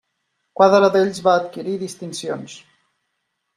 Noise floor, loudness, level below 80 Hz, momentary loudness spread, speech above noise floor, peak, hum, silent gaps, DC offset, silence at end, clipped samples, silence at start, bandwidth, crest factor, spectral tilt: -74 dBFS; -18 LUFS; -66 dBFS; 17 LU; 57 dB; -2 dBFS; none; none; under 0.1%; 1 s; under 0.1%; 0.6 s; 13.5 kHz; 18 dB; -5 dB/octave